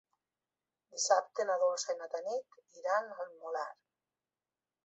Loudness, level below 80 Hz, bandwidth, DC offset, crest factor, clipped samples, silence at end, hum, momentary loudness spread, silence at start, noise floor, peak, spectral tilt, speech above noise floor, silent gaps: -35 LUFS; under -90 dBFS; 8 kHz; under 0.1%; 22 dB; under 0.1%; 1.15 s; none; 14 LU; 0.95 s; under -90 dBFS; -14 dBFS; 2 dB/octave; over 55 dB; none